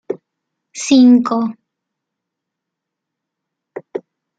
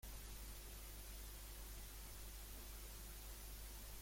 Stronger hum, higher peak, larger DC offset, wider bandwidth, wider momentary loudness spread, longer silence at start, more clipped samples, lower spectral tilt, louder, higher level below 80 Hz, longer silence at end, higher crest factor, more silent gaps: second, none vs 50 Hz at -55 dBFS; first, -2 dBFS vs -42 dBFS; neither; second, 9 kHz vs 16.5 kHz; first, 25 LU vs 0 LU; about the same, 0.1 s vs 0 s; neither; first, -4 dB/octave vs -2.5 dB/octave; first, -13 LUFS vs -54 LUFS; second, -66 dBFS vs -56 dBFS; first, 0.4 s vs 0 s; about the same, 16 dB vs 12 dB; neither